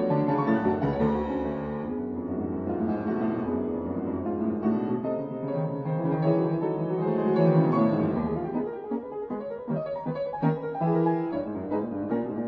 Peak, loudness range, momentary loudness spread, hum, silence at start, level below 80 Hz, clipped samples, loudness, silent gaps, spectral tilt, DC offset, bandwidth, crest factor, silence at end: -10 dBFS; 4 LU; 8 LU; none; 0 s; -52 dBFS; under 0.1%; -28 LUFS; none; -11 dB/octave; under 0.1%; 4.9 kHz; 16 dB; 0 s